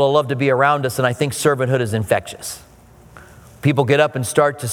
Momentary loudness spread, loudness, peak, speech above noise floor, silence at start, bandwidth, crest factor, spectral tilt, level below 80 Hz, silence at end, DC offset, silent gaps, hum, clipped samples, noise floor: 9 LU; -18 LUFS; 0 dBFS; 28 dB; 0 s; 18 kHz; 18 dB; -5 dB/octave; -52 dBFS; 0 s; under 0.1%; none; none; under 0.1%; -46 dBFS